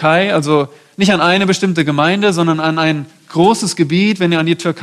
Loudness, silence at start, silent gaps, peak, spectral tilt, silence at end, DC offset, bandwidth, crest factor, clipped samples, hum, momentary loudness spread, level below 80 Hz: -13 LUFS; 0 s; none; 0 dBFS; -5 dB/octave; 0 s; under 0.1%; 13 kHz; 12 dB; under 0.1%; none; 4 LU; -54 dBFS